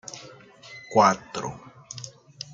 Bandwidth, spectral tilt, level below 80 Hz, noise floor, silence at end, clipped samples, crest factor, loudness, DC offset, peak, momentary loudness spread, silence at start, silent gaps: 9.4 kHz; -4 dB/octave; -64 dBFS; -48 dBFS; 0.1 s; under 0.1%; 24 dB; -23 LUFS; under 0.1%; -4 dBFS; 24 LU; 0.1 s; none